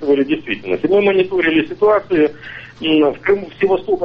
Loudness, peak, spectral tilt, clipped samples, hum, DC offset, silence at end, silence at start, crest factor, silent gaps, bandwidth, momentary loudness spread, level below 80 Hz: -16 LUFS; -4 dBFS; -7.5 dB/octave; under 0.1%; none; under 0.1%; 0 s; 0 s; 12 dB; none; 5.6 kHz; 7 LU; -48 dBFS